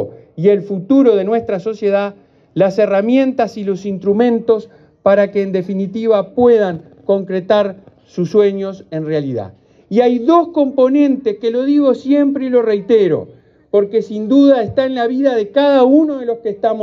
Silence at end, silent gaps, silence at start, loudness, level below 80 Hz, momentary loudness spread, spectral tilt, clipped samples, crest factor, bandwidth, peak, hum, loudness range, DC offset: 0 s; none; 0 s; -14 LUFS; -60 dBFS; 10 LU; -8 dB/octave; under 0.1%; 14 dB; 6.8 kHz; 0 dBFS; none; 3 LU; under 0.1%